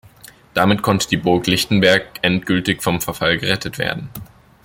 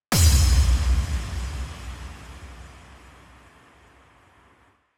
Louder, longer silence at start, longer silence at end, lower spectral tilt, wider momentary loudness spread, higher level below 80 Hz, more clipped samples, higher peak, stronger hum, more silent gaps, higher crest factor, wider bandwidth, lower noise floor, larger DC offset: first, -17 LUFS vs -22 LUFS; first, 0.55 s vs 0.1 s; second, 0.4 s vs 2.3 s; about the same, -4.5 dB/octave vs -4 dB/octave; second, 9 LU vs 25 LU; second, -46 dBFS vs -26 dBFS; neither; first, 0 dBFS vs -6 dBFS; neither; neither; about the same, 18 dB vs 18 dB; about the same, 17 kHz vs 17 kHz; second, -44 dBFS vs -60 dBFS; neither